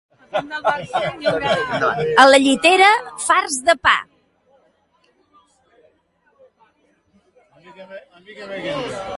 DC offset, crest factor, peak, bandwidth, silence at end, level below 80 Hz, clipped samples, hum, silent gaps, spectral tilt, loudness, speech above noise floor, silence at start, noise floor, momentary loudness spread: under 0.1%; 20 dB; 0 dBFS; 11.5 kHz; 0 s; -56 dBFS; under 0.1%; none; none; -2.5 dB/octave; -16 LUFS; 45 dB; 0.35 s; -62 dBFS; 18 LU